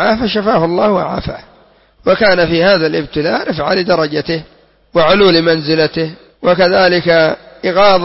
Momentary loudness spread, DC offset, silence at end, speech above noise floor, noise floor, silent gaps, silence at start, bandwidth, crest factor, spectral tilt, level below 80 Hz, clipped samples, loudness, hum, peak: 11 LU; under 0.1%; 0 s; 35 dB; -47 dBFS; none; 0 s; 6 kHz; 12 dB; -8.5 dB/octave; -40 dBFS; under 0.1%; -12 LUFS; none; 0 dBFS